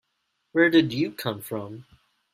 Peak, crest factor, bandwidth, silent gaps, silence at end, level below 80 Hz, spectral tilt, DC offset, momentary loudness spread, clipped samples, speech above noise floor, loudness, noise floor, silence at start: -6 dBFS; 20 dB; 16 kHz; none; 0.5 s; -66 dBFS; -5.5 dB/octave; under 0.1%; 18 LU; under 0.1%; 52 dB; -24 LUFS; -76 dBFS; 0.55 s